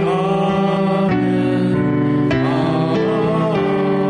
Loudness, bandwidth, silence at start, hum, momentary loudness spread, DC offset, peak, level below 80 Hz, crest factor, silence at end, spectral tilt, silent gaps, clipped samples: -17 LUFS; 10 kHz; 0 s; none; 1 LU; under 0.1%; -8 dBFS; -46 dBFS; 8 dB; 0 s; -8.5 dB/octave; none; under 0.1%